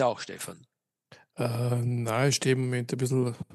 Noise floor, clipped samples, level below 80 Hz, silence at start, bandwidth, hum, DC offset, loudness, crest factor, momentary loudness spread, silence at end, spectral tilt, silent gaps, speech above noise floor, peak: -59 dBFS; under 0.1%; -72 dBFS; 0 s; 12.5 kHz; none; under 0.1%; -28 LUFS; 16 dB; 13 LU; 0 s; -5.5 dB/octave; none; 31 dB; -12 dBFS